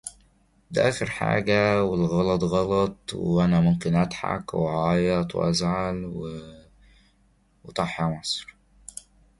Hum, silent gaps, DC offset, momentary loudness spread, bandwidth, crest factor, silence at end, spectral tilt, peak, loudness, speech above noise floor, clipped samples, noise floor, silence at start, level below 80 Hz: none; none; under 0.1%; 14 LU; 11.5 kHz; 20 dB; 0.95 s; -6 dB/octave; -6 dBFS; -24 LUFS; 39 dB; under 0.1%; -63 dBFS; 0.05 s; -48 dBFS